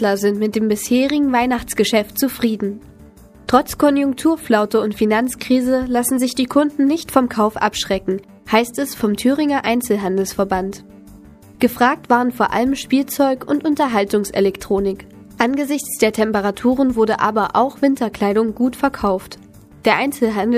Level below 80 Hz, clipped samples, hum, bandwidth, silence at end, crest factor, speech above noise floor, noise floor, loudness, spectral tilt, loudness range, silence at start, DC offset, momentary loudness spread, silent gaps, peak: -46 dBFS; under 0.1%; none; 15.5 kHz; 0 s; 18 dB; 26 dB; -43 dBFS; -18 LUFS; -4.5 dB/octave; 2 LU; 0 s; under 0.1%; 5 LU; none; 0 dBFS